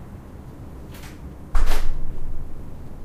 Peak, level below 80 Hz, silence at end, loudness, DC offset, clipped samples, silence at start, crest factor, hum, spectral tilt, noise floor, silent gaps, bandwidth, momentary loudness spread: -4 dBFS; -22 dBFS; 0 s; -33 LUFS; under 0.1%; under 0.1%; 0 s; 14 dB; none; -5.5 dB/octave; -38 dBFS; none; 7.6 kHz; 13 LU